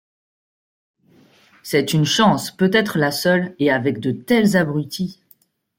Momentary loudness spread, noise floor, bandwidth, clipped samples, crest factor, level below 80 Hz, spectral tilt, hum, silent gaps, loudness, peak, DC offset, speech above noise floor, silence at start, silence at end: 10 LU; -57 dBFS; 17 kHz; under 0.1%; 18 dB; -58 dBFS; -5 dB/octave; none; none; -18 LUFS; -2 dBFS; under 0.1%; 39 dB; 1.65 s; 0.65 s